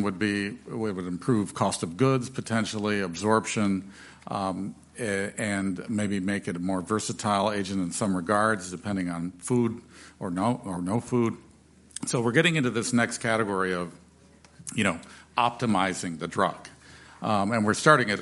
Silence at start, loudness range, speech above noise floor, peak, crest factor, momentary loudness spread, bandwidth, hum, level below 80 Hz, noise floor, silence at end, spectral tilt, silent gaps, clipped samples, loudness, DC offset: 0 s; 3 LU; 29 dB; -2 dBFS; 24 dB; 11 LU; 11.5 kHz; none; -62 dBFS; -55 dBFS; 0 s; -5 dB/octave; none; under 0.1%; -27 LUFS; under 0.1%